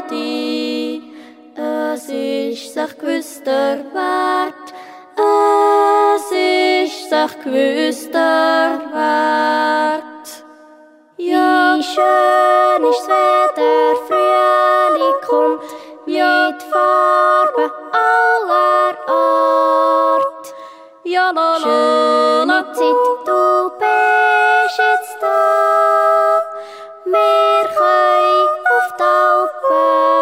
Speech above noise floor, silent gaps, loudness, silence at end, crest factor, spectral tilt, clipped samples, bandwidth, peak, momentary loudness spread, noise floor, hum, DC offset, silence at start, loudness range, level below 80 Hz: 30 dB; none; -14 LUFS; 0 s; 14 dB; -2 dB/octave; under 0.1%; 16 kHz; -2 dBFS; 10 LU; -45 dBFS; none; under 0.1%; 0 s; 4 LU; -78 dBFS